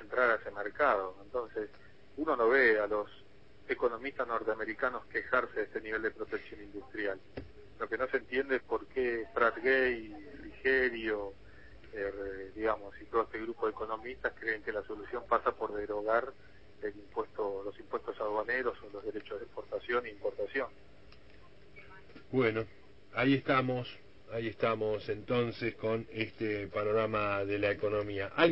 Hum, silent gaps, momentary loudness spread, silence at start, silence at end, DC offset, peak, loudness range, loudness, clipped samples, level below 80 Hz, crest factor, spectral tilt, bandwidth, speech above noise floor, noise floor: none; none; 14 LU; 0 s; 0 s; 0.2%; -12 dBFS; 6 LU; -34 LUFS; under 0.1%; -60 dBFS; 24 dB; -8 dB/octave; 5.8 kHz; 25 dB; -59 dBFS